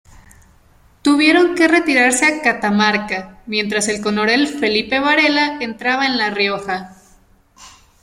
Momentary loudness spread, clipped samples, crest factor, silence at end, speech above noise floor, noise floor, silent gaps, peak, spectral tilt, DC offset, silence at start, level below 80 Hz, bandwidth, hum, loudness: 9 LU; under 0.1%; 16 dB; 0.35 s; 35 dB; -51 dBFS; none; -2 dBFS; -3 dB/octave; under 0.1%; 0.15 s; -52 dBFS; 16 kHz; none; -15 LUFS